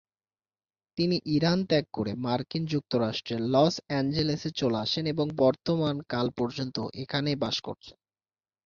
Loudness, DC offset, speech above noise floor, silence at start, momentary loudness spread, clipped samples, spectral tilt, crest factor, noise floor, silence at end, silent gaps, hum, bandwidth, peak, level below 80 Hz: -28 LUFS; under 0.1%; over 62 dB; 0.95 s; 8 LU; under 0.1%; -6.5 dB/octave; 18 dB; under -90 dBFS; 0.75 s; none; none; 7.4 kHz; -10 dBFS; -60 dBFS